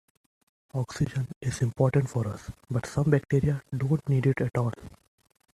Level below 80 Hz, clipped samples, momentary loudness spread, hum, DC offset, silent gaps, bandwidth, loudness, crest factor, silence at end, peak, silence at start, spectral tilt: -52 dBFS; under 0.1%; 10 LU; none; under 0.1%; 1.36-1.41 s; 12.5 kHz; -28 LUFS; 20 dB; 0.65 s; -8 dBFS; 0.75 s; -7.5 dB/octave